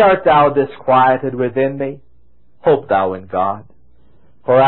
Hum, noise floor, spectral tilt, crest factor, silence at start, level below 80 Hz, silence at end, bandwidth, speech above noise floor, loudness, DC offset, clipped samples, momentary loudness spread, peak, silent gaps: none; -56 dBFS; -11.5 dB/octave; 14 dB; 0 s; -50 dBFS; 0 s; 4.2 kHz; 42 dB; -15 LUFS; 0.9%; under 0.1%; 12 LU; 0 dBFS; none